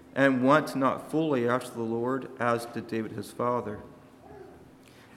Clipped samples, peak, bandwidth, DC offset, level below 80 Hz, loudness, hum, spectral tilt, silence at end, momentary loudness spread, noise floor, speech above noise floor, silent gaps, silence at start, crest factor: under 0.1%; -8 dBFS; 14.5 kHz; under 0.1%; -66 dBFS; -28 LUFS; none; -6.5 dB/octave; 0.5 s; 16 LU; -53 dBFS; 26 dB; none; 0.15 s; 22 dB